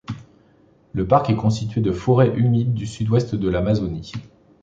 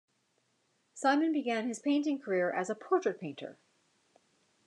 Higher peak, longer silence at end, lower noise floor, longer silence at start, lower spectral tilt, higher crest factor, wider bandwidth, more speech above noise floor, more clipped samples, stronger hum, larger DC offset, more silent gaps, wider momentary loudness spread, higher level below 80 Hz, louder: first, -2 dBFS vs -14 dBFS; second, 0.35 s vs 1.15 s; second, -55 dBFS vs -76 dBFS; second, 0.1 s vs 0.95 s; first, -8 dB/octave vs -4.5 dB/octave; about the same, 18 dB vs 20 dB; second, 8 kHz vs 10.5 kHz; second, 36 dB vs 44 dB; neither; neither; neither; neither; about the same, 15 LU vs 13 LU; first, -42 dBFS vs under -90 dBFS; first, -20 LUFS vs -32 LUFS